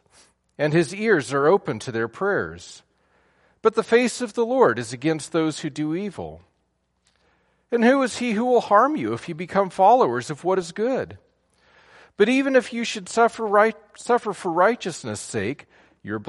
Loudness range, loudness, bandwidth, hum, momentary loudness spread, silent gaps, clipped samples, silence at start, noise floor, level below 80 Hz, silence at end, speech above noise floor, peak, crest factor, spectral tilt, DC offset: 5 LU; -22 LUFS; 11.5 kHz; none; 12 LU; none; under 0.1%; 0.6 s; -71 dBFS; -64 dBFS; 0 s; 49 dB; -4 dBFS; 20 dB; -5 dB/octave; under 0.1%